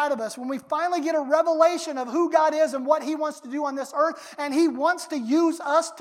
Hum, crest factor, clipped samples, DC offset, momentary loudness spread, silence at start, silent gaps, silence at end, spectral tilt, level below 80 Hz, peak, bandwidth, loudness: none; 18 dB; under 0.1%; under 0.1%; 8 LU; 0 s; none; 0 s; -3 dB/octave; -86 dBFS; -6 dBFS; 15 kHz; -24 LUFS